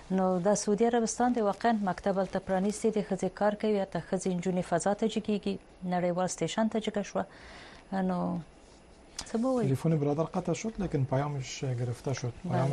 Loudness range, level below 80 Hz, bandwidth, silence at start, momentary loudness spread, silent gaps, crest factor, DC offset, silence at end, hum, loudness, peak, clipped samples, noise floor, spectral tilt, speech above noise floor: 4 LU; -56 dBFS; 11.5 kHz; 0 s; 8 LU; none; 14 dB; under 0.1%; 0 s; none; -31 LUFS; -16 dBFS; under 0.1%; -55 dBFS; -6 dB/octave; 25 dB